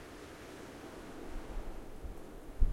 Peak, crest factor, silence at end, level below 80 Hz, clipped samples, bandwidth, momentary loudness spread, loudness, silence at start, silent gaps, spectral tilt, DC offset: -14 dBFS; 22 dB; 0 s; -40 dBFS; under 0.1%; 13 kHz; 3 LU; -48 LUFS; 0 s; none; -6 dB/octave; under 0.1%